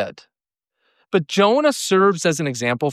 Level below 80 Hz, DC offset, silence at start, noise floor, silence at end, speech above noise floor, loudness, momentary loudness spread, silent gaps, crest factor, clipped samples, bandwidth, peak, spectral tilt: -70 dBFS; under 0.1%; 0 s; -85 dBFS; 0 s; 66 dB; -18 LUFS; 7 LU; none; 14 dB; under 0.1%; 15 kHz; -4 dBFS; -4.5 dB/octave